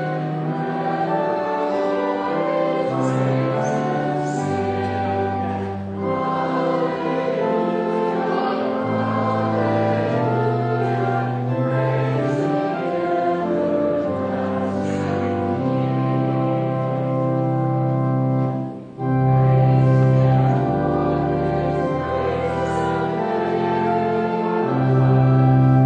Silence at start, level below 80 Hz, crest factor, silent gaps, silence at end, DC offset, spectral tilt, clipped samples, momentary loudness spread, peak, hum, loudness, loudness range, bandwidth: 0 s; -48 dBFS; 14 dB; none; 0 s; under 0.1%; -8.5 dB/octave; under 0.1%; 7 LU; -6 dBFS; none; -20 LUFS; 4 LU; 8 kHz